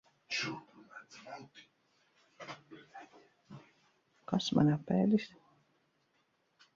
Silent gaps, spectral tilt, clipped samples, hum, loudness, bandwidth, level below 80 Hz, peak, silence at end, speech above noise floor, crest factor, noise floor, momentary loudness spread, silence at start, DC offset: none; -6 dB/octave; under 0.1%; none; -33 LUFS; 7.6 kHz; -74 dBFS; -16 dBFS; 1.5 s; 44 dB; 22 dB; -76 dBFS; 26 LU; 0.3 s; under 0.1%